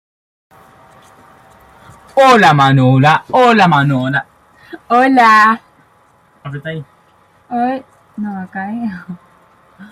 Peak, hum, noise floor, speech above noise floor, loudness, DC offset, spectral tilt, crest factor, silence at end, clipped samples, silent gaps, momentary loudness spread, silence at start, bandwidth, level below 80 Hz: 0 dBFS; none; -51 dBFS; 40 dB; -11 LUFS; under 0.1%; -6.5 dB/octave; 14 dB; 0.05 s; under 0.1%; none; 19 LU; 2.15 s; 14.5 kHz; -54 dBFS